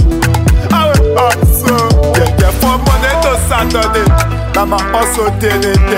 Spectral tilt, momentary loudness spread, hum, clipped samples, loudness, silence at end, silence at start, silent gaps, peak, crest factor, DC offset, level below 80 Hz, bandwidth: -5 dB/octave; 3 LU; none; under 0.1%; -11 LUFS; 0 s; 0 s; none; 0 dBFS; 10 dB; under 0.1%; -14 dBFS; 16.5 kHz